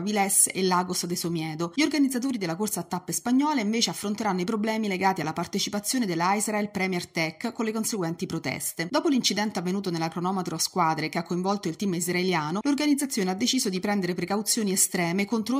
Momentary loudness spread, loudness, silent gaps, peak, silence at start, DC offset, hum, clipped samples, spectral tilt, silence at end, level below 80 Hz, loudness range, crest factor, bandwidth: 7 LU; -26 LUFS; none; -8 dBFS; 0 s; under 0.1%; none; under 0.1%; -3.5 dB/octave; 0 s; -68 dBFS; 2 LU; 18 dB; 16 kHz